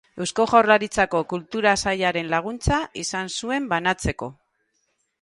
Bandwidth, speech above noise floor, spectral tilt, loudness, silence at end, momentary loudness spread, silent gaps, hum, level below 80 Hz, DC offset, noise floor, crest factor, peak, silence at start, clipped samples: 11.5 kHz; 49 dB; -4 dB/octave; -22 LUFS; 0.9 s; 10 LU; none; none; -42 dBFS; under 0.1%; -71 dBFS; 20 dB; -2 dBFS; 0.15 s; under 0.1%